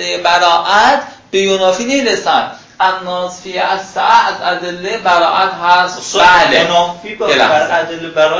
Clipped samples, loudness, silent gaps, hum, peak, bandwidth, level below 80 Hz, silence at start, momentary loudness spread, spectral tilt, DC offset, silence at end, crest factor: 0.1%; -12 LUFS; none; none; 0 dBFS; 8 kHz; -50 dBFS; 0 s; 10 LU; -2.5 dB/octave; under 0.1%; 0 s; 12 dB